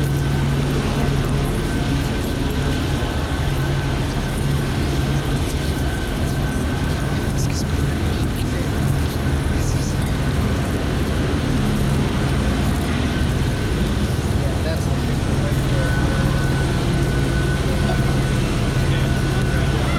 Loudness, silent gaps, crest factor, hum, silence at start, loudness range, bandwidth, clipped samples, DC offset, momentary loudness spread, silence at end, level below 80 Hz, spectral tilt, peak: -21 LUFS; none; 12 dB; none; 0 s; 2 LU; 16 kHz; under 0.1%; under 0.1%; 3 LU; 0 s; -26 dBFS; -6 dB/octave; -6 dBFS